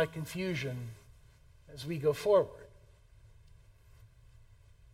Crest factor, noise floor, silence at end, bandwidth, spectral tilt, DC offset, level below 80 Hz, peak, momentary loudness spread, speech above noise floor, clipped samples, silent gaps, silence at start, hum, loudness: 22 dB; -60 dBFS; 0.9 s; 16 kHz; -6 dB/octave; under 0.1%; -60 dBFS; -14 dBFS; 24 LU; 27 dB; under 0.1%; none; 0 s; none; -33 LUFS